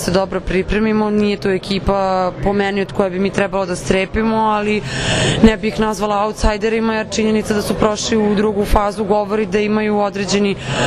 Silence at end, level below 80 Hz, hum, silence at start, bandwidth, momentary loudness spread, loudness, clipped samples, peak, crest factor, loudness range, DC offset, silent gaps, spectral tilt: 0 s; -28 dBFS; none; 0 s; 13.5 kHz; 3 LU; -17 LUFS; under 0.1%; 0 dBFS; 16 dB; 1 LU; under 0.1%; none; -5 dB/octave